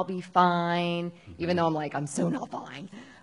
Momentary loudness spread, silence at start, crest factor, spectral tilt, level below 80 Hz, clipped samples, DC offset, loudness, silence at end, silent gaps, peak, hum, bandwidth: 16 LU; 0 s; 22 dB; -5.5 dB/octave; -64 dBFS; under 0.1%; under 0.1%; -28 LUFS; 0.1 s; none; -8 dBFS; none; 11 kHz